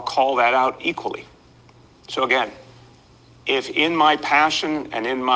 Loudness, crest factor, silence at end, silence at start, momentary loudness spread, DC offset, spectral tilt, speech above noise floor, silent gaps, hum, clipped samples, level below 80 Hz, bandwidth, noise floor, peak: -20 LUFS; 20 dB; 0 s; 0 s; 13 LU; under 0.1%; -3 dB/octave; 30 dB; none; none; under 0.1%; -60 dBFS; 9.8 kHz; -50 dBFS; -2 dBFS